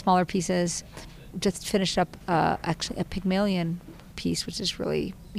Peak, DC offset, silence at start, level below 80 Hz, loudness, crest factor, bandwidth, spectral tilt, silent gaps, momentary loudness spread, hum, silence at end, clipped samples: -12 dBFS; under 0.1%; 0 s; -48 dBFS; -27 LUFS; 16 dB; 15.5 kHz; -4.5 dB/octave; none; 10 LU; none; 0 s; under 0.1%